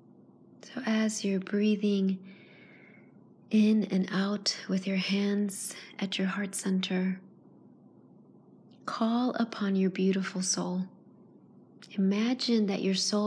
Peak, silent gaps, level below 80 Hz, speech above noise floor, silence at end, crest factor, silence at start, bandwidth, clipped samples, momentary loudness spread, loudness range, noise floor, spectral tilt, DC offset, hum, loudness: -14 dBFS; none; -88 dBFS; 28 dB; 0 s; 16 dB; 0.65 s; 11 kHz; under 0.1%; 10 LU; 4 LU; -57 dBFS; -5 dB/octave; under 0.1%; none; -30 LUFS